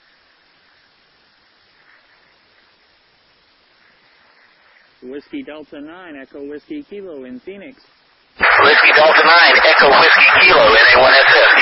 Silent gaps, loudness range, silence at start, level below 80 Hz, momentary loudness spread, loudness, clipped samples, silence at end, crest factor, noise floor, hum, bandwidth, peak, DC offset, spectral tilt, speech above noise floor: none; 26 LU; 5.05 s; -48 dBFS; 25 LU; -8 LUFS; under 0.1%; 0 s; 14 dB; -55 dBFS; none; 5.8 kHz; 0 dBFS; under 0.1%; -5.5 dB/octave; 43 dB